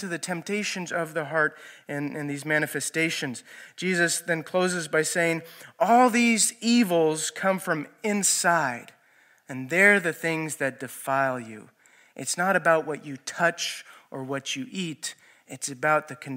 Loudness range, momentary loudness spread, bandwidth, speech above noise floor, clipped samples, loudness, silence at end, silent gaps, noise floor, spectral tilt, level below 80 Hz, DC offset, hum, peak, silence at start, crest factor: 5 LU; 15 LU; 16 kHz; 35 dB; under 0.1%; -25 LUFS; 0 s; none; -60 dBFS; -3 dB/octave; -82 dBFS; under 0.1%; none; -4 dBFS; 0 s; 24 dB